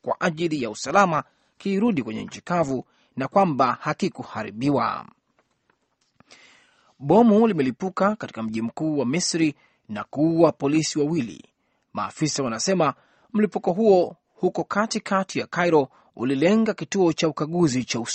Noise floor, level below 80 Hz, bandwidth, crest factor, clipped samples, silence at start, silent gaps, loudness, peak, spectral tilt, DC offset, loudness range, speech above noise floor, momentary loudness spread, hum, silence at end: -69 dBFS; -62 dBFS; 8.8 kHz; 20 dB; under 0.1%; 0.05 s; none; -23 LUFS; -2 dBFS; -5.5 dB/octave; under 0.1%; 3 LU; 47 dB; 12 LU; none; 0 s